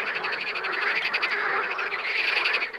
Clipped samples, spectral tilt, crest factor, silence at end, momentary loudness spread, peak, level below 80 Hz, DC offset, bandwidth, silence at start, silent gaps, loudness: under 0.1%; -1.5 dB/octave; 16 dB; 0 s; 5 LU; -10 dBFS; -74 dBFS; under 0.1%; 16 kHz; 0 s; none; -25 LUFS